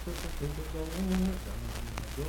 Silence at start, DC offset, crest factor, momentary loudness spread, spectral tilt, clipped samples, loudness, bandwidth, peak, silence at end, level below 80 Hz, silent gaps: 0 s; under 0.1%; 16 dB; 8 LU; -5.5 dB/octave; under 0.1%; -35 LUFS; 18.5 kHz; -18 dBFS; 0 s; -38 dBFS; none